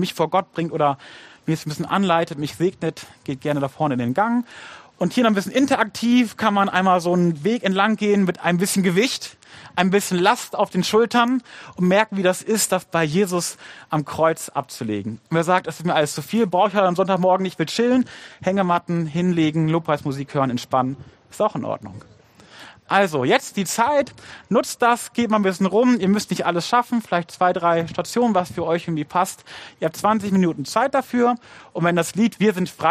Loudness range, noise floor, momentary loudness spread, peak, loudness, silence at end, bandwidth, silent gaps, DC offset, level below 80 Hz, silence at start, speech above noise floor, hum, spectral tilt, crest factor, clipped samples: 4 LU; -46 dBFS; 9 LU; 0 dBFS; -20 LUFS; 0 s; 15 kHz; none; under 0.1%; -62 dBFS; 0 s; 25 dB; none; -5 dB/octave; 20 dB; under 0.1%